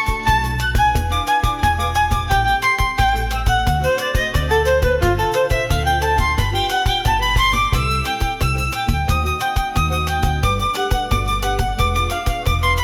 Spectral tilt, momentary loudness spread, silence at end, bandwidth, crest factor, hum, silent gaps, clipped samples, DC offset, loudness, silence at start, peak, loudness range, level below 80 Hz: -4.5 dB/octave; 4 LU; 0 s; 18 kHz; 12 dB; none; none; under 0.1%; under 0.1%; -18 LUFS; 0 s; -4 dBFS; 2 LU; -24 dBFS